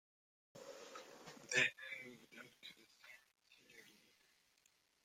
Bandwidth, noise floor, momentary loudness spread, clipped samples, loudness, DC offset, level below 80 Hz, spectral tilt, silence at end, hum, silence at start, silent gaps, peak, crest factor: 16.5 kHz; -77 dBFS; 26 LU; under 0.1%; -40 LUFS; under 0.1%; under -90 dBFS; -1.5 dB/octave; 1.1 s; none; 0.55 s; none; -20 dBFS; 28 dB